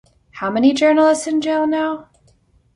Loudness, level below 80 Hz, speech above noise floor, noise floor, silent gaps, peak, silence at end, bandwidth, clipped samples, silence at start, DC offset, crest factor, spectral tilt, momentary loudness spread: -17 LUFS; -58 dBFS; 40 dB; -56 dBFS; none; -2 dBFS; 0.75 s; 11.5 kHz; under 0.1%; 0.35 s; under 0.1%; 16 dB; -4 dB/octave; 11 LU